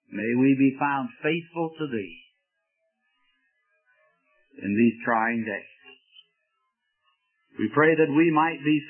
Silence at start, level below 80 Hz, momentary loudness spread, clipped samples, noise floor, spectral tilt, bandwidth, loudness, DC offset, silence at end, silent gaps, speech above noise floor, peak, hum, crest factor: 0.1 s; -74 dBFS; 13 LU; under 0.1%; -78 dBFS; -11 dB/octave; 3.3 kHz; -24 LUFS; under 0.1%; 0 s; none; 54 dB; -8 dBFS; none; 20 dB